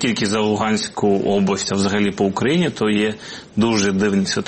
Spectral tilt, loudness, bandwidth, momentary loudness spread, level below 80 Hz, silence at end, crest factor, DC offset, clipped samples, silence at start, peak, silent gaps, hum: -5 dB/octave; -19 LUFS; 8.8 kHz; 3 LU; -52 dBFS; 0 s; 14 dB; under 0.1%; under 0.1%; 0 s; -4 dBFS; none; none